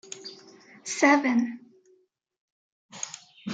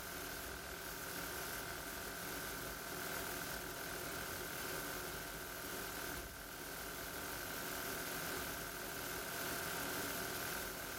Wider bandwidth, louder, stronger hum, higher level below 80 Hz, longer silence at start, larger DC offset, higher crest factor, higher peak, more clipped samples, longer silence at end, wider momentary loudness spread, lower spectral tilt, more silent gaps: second, 9.4 kHz vs 17 kHz; first, -25 LUFS vs -43 LUFS; neither; second, -86 dBFS vs -60 dBFS; about the same, 0.1 s vs 0 s; neither; first, 22 dB vs 16 dB; first, -6 dBFS vs -28 dBFS; neither; about the same, 0 s vs 0 s; first, 21 LU vs 4 LU; about the same, -3 dB/octave vs -2 dB/octave; first, 2.38-2.89 s vs none